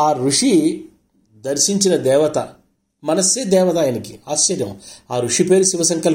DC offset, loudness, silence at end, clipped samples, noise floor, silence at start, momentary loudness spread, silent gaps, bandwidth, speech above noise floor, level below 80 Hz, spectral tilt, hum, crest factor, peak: under 0.1%; -16 LUFS; 0 s; under 0.1%; -54 dBFS; 0 s; 14 LU; none; 17 kHz; 37 dB; -60 dBFS; -3.5 dB/octave; none; 16 dB; -2 dBFS